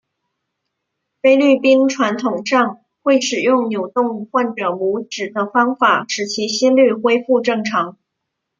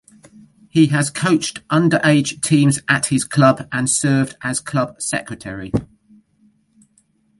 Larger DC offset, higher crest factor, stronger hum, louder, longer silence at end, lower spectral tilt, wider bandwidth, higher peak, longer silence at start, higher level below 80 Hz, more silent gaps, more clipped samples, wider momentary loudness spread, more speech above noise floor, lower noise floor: neither; about the same, 16 dB vs 18 dB; neither; about the same, -16 LUFS vs -17 LUFS; second, 0.7 s vs 1.55 s; about the same, -4 dB/octave vs -5 dB/octave; second, 7.6 kHz vs 11.5 kHz; about the same, -2 dBFS vs 0 dBFS; first, 1.25 s vs 0.75 s; second, -68 dBFS vs -52 dBFS; neither; neither; about the same, 9 LU vs 9 LU; first, 61 dB vs 43 dB; first, -77 dBFS vs -60 dBFS